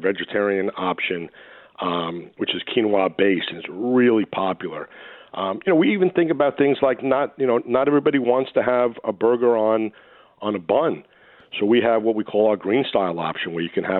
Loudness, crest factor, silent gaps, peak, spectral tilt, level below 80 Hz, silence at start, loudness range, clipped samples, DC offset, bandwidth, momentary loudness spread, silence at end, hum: -21 LUFS; 16 dB; none; -4 dBFS; -10 dB/octave; -66 dBFS; 0 s; 3 LU; under 0.1%; under 0.1%; 4.2 kHz; 11 LU; 0 s; none